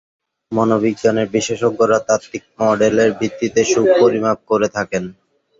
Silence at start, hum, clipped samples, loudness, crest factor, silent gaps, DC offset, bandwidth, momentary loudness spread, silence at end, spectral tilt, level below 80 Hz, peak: 0.5 s; none; under 0.1%; -16 LUFS; 16 dB; none; under 0.1%; 7.8 kHz; 9 LU; 0.5 s; -5 dB/octave; -54 dBFS; -2 dBFS